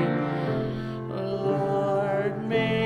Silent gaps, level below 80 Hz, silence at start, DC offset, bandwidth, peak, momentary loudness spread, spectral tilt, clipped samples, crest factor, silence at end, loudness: none; -54 dBFS; 0 s; under 0.1%; 10 kHz; -12 dBFS; 6 LU; -8 dB/octave; under 0.1%; 14 dB; 0 s; -27 LUFS